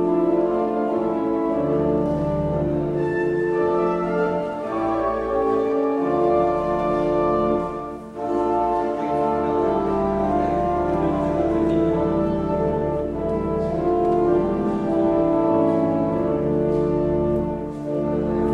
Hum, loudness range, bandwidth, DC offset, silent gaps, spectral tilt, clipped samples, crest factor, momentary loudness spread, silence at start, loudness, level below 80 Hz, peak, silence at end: none; 2 LU; 7.4 kHz; under 0.1%; none; -9 dB/octave; under 0.1%; 14 dB; 5 LU; 0 s; -22 LUFS; -40 dBFS; -8 dBFS; 0 s